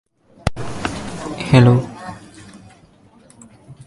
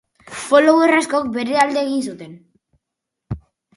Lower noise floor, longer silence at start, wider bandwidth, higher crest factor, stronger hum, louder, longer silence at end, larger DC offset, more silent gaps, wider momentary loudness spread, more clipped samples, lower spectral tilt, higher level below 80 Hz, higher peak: second, -49 dBFS vs -81 dBFS; first, 0.45 s vs 0.3 s; about the same, 11.5 kHz vs 11.5 kHz; about the same, 20 dB vs 18 dB; neither; about the same, -18 LUFS vs -16 LUFS; second, 0.05 s vs 0.4 s; neither; neither; first, 23 LU vs 20 LU; neither; first, -7 dB/octave vs -4.5 dB/octave; first, -40 dBFS vs -50 dBFS; about the same, 0 dBFS vs 0 dBFS